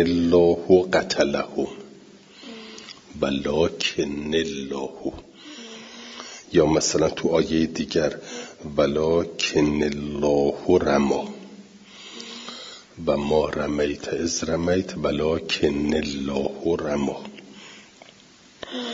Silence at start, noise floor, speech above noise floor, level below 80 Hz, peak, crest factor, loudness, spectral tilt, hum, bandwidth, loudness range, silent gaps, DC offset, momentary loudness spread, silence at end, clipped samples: 0 s; -51 dBFS; 29 dB; -48 dBFS; -4 dBFS; 20 dB; -23 LUFS; -4.5 dB/octave; none; 7.8 kHz; 5 LU; none; under 0.1%; 21 LU; 0 s; under 0.1%